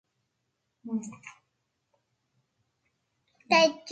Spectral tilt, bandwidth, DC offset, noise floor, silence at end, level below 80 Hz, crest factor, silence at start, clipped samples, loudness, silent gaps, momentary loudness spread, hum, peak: -3 dB/octave; 9 kHz; under 0.1%; -80 dBFS; 0 s; -80 dBFS; 24 dB; 0.85 s; under 0.1%; -26 LUFS; none; 22 LU; none; -8 dBFS